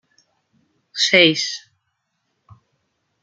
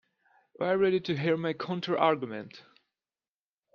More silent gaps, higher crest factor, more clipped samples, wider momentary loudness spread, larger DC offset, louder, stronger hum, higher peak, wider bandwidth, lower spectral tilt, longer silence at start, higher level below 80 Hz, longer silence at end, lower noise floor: neither; about the same, 22 dB vs 20 dB; neither; first, 20 LU vs 12 LU; neither; first, -15 LUFS vs -29 LUFS; neither; first, -2 dBFS vs -10 dBFS; first, 9.4 kHz vs 6.8 kHz; second, -2.5 dB/octave vs -7.5 dB/octave; first, 0.95 s vs 0.6 s; about the same, -68 dBFS vs -72 dBFS; first, 1.65 s vs 1.15 s; second, -73 dBFS vs under -90 dBFS